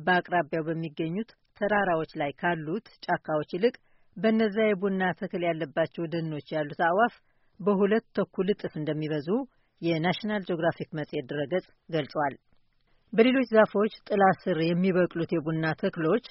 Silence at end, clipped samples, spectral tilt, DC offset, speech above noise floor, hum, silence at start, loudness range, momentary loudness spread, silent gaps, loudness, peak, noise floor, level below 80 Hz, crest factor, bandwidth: 0.05 s; under 0.1%; -5 dB/octave; under 0.1%; 39 dB; none; 0 s; 5 LU; 9 LU; none; -28 LUFS; -8 dBFS; -66 dBFS; -66 dBFS; 20 dB; 5.8 kHz